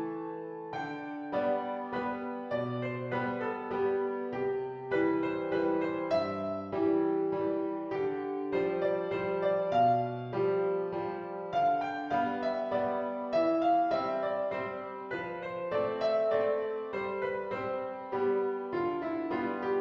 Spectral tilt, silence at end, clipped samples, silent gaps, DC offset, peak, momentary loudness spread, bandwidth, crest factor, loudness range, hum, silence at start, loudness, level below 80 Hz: -8 dB/octave; 0 s; under 0.1%; none; under 0.1%; -16 dBFS; 9 LU; 6.6 kHz; 16 dB; 3 LU; none; 0 s; -32 LUFS; -70 dBFS